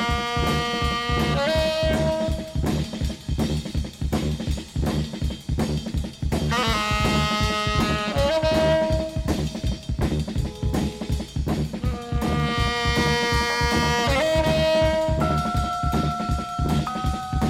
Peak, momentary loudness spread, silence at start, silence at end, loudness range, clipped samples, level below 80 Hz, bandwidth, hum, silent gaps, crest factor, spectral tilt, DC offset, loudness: -8 dBFS; 7 LU; 0 s; 0 s; 6 LU; under 0.1%; -30 dBFS; 16 kHz; none; none; 14 dB; -5.5 dB/octave; under 0.1%; -23 LUFS